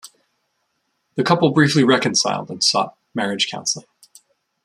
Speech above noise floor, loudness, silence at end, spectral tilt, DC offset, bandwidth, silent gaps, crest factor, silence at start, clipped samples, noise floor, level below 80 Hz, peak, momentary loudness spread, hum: 53 dB; -18 LUFS; 0.85 s; -4 dB/octave; under 0.1%; 14 kHz; none; 18 dB; 0.05 s; under 0.1%; -71 dBFS; -62 dBFS; -2 dBFS; 11 LU; none